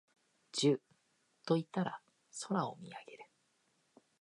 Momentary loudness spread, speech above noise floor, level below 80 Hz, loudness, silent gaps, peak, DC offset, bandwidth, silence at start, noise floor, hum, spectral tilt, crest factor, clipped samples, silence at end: 19 LU; 41 dB; -88 dBFS; -37 LUFS; none; -18 dBFS; under 0.1%; 11 kHz; 0.55 s; -77 dBFS; none; -5 dB/octave; 20 dB; under 0.1%; 1 s